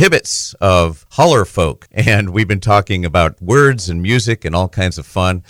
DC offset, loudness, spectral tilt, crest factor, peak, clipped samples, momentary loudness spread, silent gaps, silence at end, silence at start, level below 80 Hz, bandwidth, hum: under 0.1%; -14 LUFS; -5 dB/octave; 14 dB; 0 dBFS; under 0.1%; 7 LU; none; 0.1 s; 0 s; -32 dBFS; 17.5 kHz; none